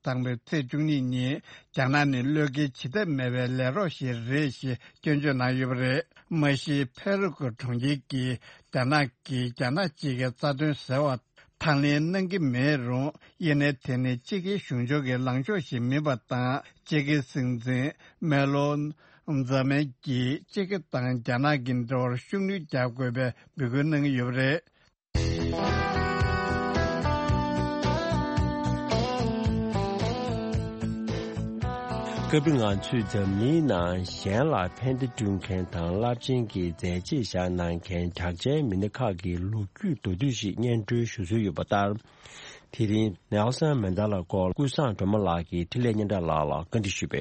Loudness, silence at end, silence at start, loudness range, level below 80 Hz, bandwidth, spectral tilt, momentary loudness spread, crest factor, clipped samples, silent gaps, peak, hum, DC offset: -28 LUFS; 0 s; 0.05 s; 2 LU; -46 dBFS; 8.4 kHz; -6.5 dB/octave; 7 LU; 18 dB; under 0.1%; none; -10 dBFS; none; under 0.1%